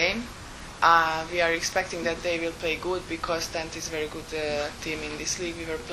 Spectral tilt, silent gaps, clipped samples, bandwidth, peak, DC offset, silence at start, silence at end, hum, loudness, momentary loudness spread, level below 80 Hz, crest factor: -2.5 dB/octave; none; under 0.1%; 13.5 kHz; -4 dBFS; under 0.1%; 0 s; 0 s; none; -27 LUFS; 11 LU; -48 dBFS; 24 dB